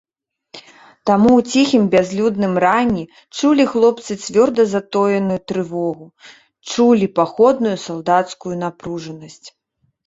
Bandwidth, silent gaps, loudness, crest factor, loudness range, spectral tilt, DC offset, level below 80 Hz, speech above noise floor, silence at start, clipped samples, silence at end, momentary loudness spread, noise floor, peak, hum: 8 kHz; none; -16 LUFS; 16 dB; 3 LU; -5.5 dB/octave; under 0.1%; -54 dBFS; 31 dB; 0.55 s; under 0.1%; 0.55 s; 12 LU; -47 dBFS; -2 dBFS; none